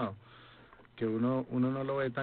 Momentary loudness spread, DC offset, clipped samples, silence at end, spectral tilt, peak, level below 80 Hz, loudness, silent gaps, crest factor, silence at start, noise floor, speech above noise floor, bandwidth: 7 LU; under 0.1%; under 0.1%; 0 s; -11 dB/octave; -22 dBFS; -68 dBFS; -33 LUFS; none; 14 dB; 0 s; -58 dBFS; 26 dB; 4.4 kHz